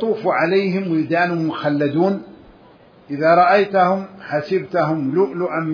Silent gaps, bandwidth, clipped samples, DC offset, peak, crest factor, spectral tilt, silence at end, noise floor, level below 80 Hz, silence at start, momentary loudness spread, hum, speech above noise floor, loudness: none; 5.4 kHz; under 0.1%; under 0.1%; -2 dBFS; 16 dB; -8.5 dB/octave; 0 s; -47 dBFS; -62 dBFS; 0 s; 9 LU; none; 30 dB; -18 LUFS